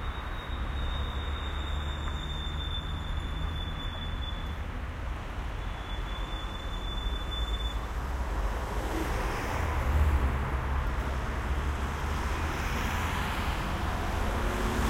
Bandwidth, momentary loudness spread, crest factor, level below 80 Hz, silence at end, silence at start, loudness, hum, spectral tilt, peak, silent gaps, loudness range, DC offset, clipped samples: 16 kHz; 6 LU; 16 dB; -34 dBFS; 0 s; 0 s; -33 LUFS; none; -5.5 dB/octave; -14 dBFS; none; 5 LU; under 0.1%; under 0.1%